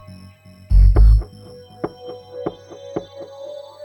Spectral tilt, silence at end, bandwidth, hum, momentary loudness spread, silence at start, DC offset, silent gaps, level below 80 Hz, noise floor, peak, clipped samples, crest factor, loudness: -8.5 dB/octave; 0.25 s; 5.8 kHz; none; 24 LU; 0.7 s; under 0.1%; none; -18 dBFS; -43 dBFS; -2 dBFS; under 0.1%; 16 dB; -20 LUFS